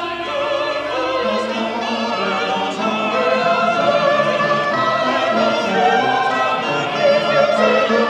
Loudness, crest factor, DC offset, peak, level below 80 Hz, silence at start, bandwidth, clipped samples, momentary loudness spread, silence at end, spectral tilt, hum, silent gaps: -17 LUFS; 16 dB; under 0.1%; -2 dBFS; -58 dBFS; 0 s; 10 kHz; under 0.1%; 6 LU; 0 s; -4.5 dB/octave; none; none